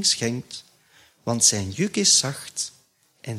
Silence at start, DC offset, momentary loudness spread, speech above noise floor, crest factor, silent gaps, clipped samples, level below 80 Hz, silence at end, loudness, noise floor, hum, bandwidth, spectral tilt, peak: 0 s; under 0.1%; 20 LU; 34 dB; 22 dB; none; under 0.1%; -64 dBFS; 0 s; -21 LUFS; -57 dBFS; none; 16 kHz; -2 dB/octave; -4 dBFS